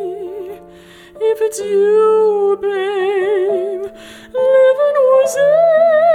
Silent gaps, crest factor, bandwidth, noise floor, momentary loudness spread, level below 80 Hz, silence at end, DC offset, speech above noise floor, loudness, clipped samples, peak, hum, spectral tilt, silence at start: none; 12 dB; 15 kHz; -40 dBFS; 15 LU; -60 dBFS; 0 s; under 0.1%; 27 dB; -13 LUFS; under 0.1%; -2 dBFS; none; -4 dB/octave; 0 s